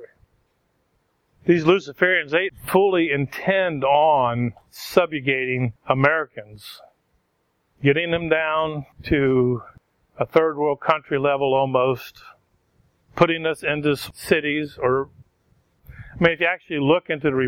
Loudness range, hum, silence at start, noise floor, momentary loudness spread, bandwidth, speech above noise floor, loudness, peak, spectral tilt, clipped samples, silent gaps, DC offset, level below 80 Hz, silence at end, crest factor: 4 LU; none; 0 s; -69 dBFS; 11 LU; 17 kHz; 49 dB; -21 LUFS; 0 dBFS; -6.5 dB/octave; under 0.1%; none; under 0.1%; -52 dBFS; 0 s; 22 dB